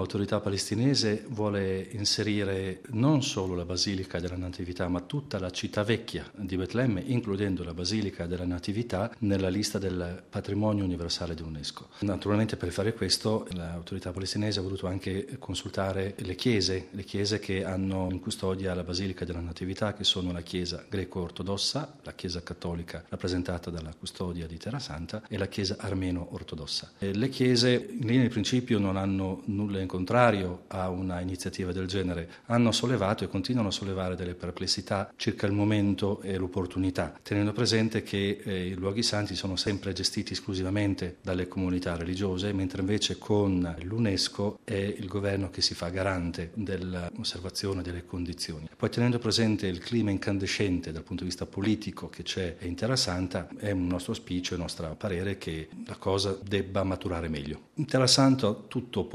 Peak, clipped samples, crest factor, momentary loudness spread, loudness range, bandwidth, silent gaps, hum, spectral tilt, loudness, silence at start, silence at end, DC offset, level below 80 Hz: -6 dBFS; under 0.1%; 24 dB; 10 LU; 5 LU; 13.5 kHz; none; none; -5 dB/octave; -30 LUFS; 0 s; 0 s; under 0.1%; -54 dBFS